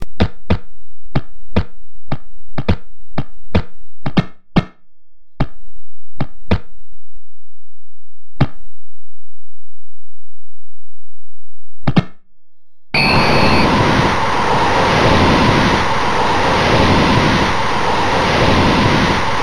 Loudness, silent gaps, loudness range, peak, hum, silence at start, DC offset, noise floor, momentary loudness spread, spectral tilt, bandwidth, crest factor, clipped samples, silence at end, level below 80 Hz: -15 LUFS; none; 17 LU; 0 dBFS; none; 0 s; under 0.1%; -88 dBFS; 16 LU; -5.5 dB/octave; 14.5 kHz; 14 dB; under 0.1%; 0 s; -30 dBFS